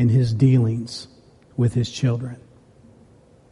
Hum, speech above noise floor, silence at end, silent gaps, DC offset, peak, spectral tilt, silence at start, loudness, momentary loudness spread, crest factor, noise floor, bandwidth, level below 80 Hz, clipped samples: none; 32 dB; 1.15 s; none; under 0.1%; -6 dBFS; -7.5 dB/octave; 0 s; -21 LUFS; 18 LU; 16 dB; -52 dBFS; 11 kHz; -52 dBFS; under 0.1%